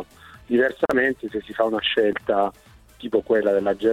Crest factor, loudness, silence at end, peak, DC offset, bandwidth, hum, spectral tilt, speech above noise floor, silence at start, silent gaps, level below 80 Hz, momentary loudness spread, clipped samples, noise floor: 16 dB; -22 LUFS; 0 s; -6 dBFS; under 0.1%; 15 kHz; none; -5.5 dB/octave; 21 dB; 0 s; none; -54 dBFS; 9 LU; under 0.1%; -43 dBFS